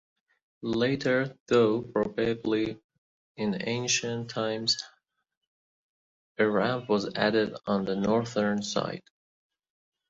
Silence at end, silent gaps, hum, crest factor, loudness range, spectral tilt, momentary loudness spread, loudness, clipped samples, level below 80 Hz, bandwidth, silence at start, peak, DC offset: 1.1 s; 1.40-1.46 s, 2.84-2.89 s, 2.98-3.35 s, 5.37-5.41 s, 5.47-6.35 s; none; 20 dB; 3 LU; -4.5 dB/octave; 8 LU; -28 LUFS; under 0.1%; -64 dBFS; 7.8 kHz; 0.6 s; -10 dBFS; under 0.1%